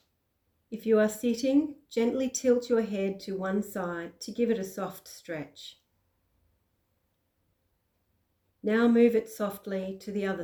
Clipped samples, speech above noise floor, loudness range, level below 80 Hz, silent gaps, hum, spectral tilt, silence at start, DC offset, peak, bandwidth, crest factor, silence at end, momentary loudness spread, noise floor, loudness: under 0.1%; 47 dB; 15 LU; -68 dBFS; none; none; -5.5 dB/octave; 0.7 s; under 0.1%; -12 dBFS; 20 kHz; 18 dB; 0 s; 15 LU; -76 dBFS; -29 LUFS